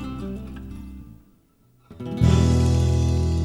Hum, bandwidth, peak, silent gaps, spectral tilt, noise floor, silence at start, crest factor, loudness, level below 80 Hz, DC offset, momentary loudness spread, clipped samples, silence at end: none; 11.5 kHz; -4 dBFS; none; -7 dB/octave; -59 dBFS; 0 s; 18 dB; -21 LUFS; -30 dBFS; under 0.1%; 20 LU; under 0.1%; 0 s